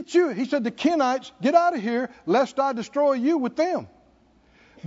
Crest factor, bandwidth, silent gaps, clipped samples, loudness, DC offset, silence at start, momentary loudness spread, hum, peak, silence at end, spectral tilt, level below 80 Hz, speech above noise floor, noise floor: 18 dB; 7.8 kHz; none; under 0.1%; -23 LUFS; under 0.1%; 0 s; 6 LU; none; -6 dBFS; 0 s; -5.5 dB/octave; -68 dBFS; 36 dB; -58 dBFS